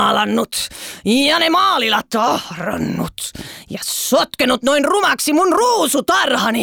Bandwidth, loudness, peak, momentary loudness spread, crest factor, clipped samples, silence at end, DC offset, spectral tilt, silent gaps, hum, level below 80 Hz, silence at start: over 20 kHz; -16 LUFS; -2 dBFS; 11 LU; 14 dB; under 0.1%; 0 s; under 0.1%; -3 dB/octave; none; none; -50 dBFS; 0 s